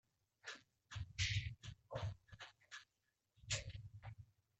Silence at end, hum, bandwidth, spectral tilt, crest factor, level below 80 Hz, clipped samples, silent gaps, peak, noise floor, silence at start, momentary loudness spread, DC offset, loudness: 0.35 s; none; 8.4 kHz; -2.5 dB/octave; 22 dB; -62 dBFS; under 0.1%; none; -28 dBFS; -88 dBFS; 0.45 s; 17 LU; under 0.1%; -48 LUFS